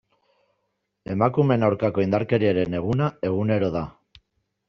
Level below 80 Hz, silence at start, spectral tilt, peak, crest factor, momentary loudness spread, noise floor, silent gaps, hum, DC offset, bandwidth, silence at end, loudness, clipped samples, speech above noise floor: -54 dBFS; 1.1 s; -7 dB/octave; -4 dBFS; 20 dB; 10 LU; -76 dBFS; none; none; under 0.1%; 6.6 kHz; 0.8 s; -23 LUFS; under 0.1%; 54 dB